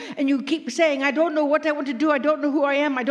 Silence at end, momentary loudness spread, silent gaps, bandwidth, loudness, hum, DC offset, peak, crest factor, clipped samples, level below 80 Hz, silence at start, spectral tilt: 0 s; 4 LU; none; 10 kHz; -21 LUFS; none; under 0.1%; -8 dBFS; 14 dB; under 0.1%; -82 dBFS; 0 s; -3.5 dB/octave